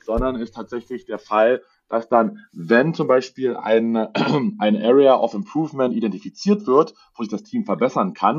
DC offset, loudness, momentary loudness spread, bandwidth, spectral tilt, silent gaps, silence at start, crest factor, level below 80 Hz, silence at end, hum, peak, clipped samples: under 0.1%; -20 LUFS; 14 LU; 7.4 kHz; -7 dB/octave; none; 0.1 s; 18 dB; -42 dBFS; 0 s; none; -2 dBFS; under 0.1%